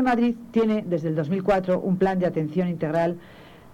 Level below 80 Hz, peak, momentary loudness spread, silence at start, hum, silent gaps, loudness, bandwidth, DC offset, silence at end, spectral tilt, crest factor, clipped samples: -52 dBFS; -10 dBFS; 4 LU; 0 s; none; none; -24 LUFS; 9.4 kHz; under 0.1%; 0.05 s; -8.5 dB/octave; 14 dB; under 0.1%